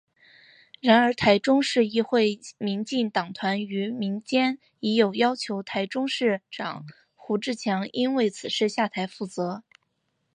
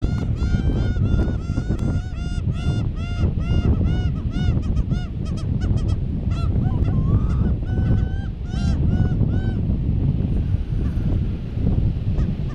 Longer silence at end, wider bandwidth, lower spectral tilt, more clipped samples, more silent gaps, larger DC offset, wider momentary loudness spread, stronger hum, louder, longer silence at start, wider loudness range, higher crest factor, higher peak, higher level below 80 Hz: first, 0.75 s vs 0 s; first, 10 kHz vs 8.4 kHz; second, -5 dB/octave vs -8.5 dB/octave; neither; neither; neither; first, 11 LU vs 5 LU; neither; about the same, -25 LUFS vs -23 LUFS; first, 0.85 s vs 0 s; first, 5 LU vs 1 LU; first, 20 dB vs 14 dB; about the same, -4 dBFS vs -6 dBFS; second, -66 dBFS vs -24 dBFS